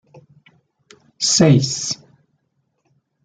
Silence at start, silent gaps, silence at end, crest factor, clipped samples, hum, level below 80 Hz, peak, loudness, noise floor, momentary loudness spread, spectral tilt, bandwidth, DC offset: 1.2 s; none; 1.3 s; 20 dB; under 0.1%; none; -58 dBFS; -2 dBFS; -16 LUFS; -69 dBFS; 13 LU; -4.5 dB/octave; 9.6 kHz; under 0.1%